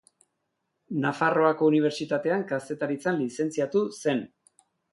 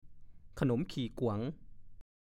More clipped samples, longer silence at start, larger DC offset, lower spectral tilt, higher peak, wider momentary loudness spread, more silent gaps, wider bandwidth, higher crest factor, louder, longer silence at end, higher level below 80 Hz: neither; first, 0.9 s vs 0.05 s; neither; second, -6 dB/octave vs -7.5 dB/octave; first, -8 dBFS vs -18 dBFS; second, 9 LU vs 18 LU; neither; second, 11.5 kHz vs 13 kHz; about the same, 20 dB vs 20 dB; first, -26 LUFS vs -36 LUFS; first, 0.65 s vs 0.4 s; second, -74 dBFS vs -56 dBFS